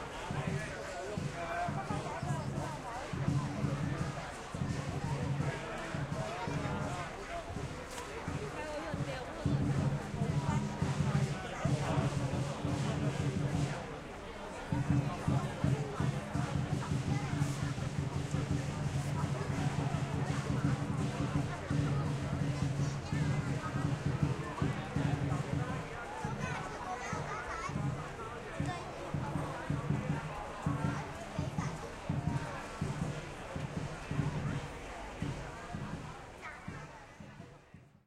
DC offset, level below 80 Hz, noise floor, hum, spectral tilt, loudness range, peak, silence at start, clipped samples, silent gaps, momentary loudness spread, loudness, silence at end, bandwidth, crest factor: under 0.1%; -52 dBFS; -58 dBFS; none; -6.5 dB/octave; 5 LU; -18 dBFS; 0 s; under 0.1%; none; 9 LU; -37 LUFS; 0.2 s; 12.5 kHz; 18 dB